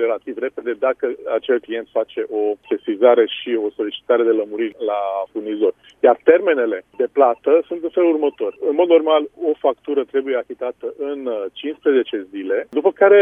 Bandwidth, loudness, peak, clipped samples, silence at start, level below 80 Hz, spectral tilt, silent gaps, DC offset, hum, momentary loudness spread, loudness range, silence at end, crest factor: 3.7 kHz; -19 LUFS; 0 dBFS; under 0.1%; 0 s; -68 dBFS; -6.5 dB/octave; none; under 0.1%; none; 11 LU; 4 LU; 0 s; 18 dB